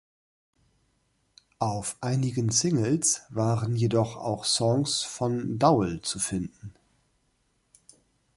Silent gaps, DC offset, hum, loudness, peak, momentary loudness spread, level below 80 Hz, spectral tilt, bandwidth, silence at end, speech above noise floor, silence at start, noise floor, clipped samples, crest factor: none; under 0.1%; none; -26 LUFS; -6 dBFS; 7 LU; -56 dBFS; -4.5 dB/octave; 11.5 kHz; 1.65 s; 45 dB; 1.6 s; -71 dBFS; under 0.1%; 22 dB